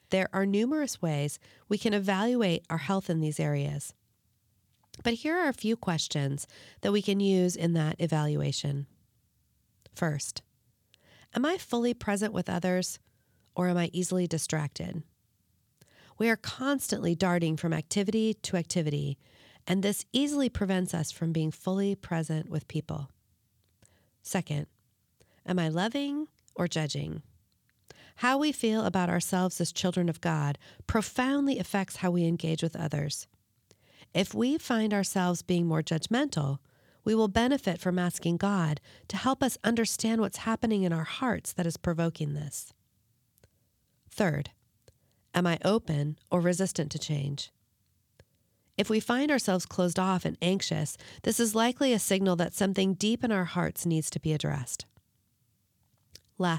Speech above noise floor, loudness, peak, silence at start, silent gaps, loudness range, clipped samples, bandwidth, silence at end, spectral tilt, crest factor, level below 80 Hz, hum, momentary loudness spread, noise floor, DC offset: 43 dB; -30 LUFS; -12 dBFS; 0.1 s; none; 6 LU; under 0.1%; 17.5 kHz; 0 s; -5 dB/octave; 18 dB; -60 dBFS; none; 9 LU; -72 dBFS; under 0.1%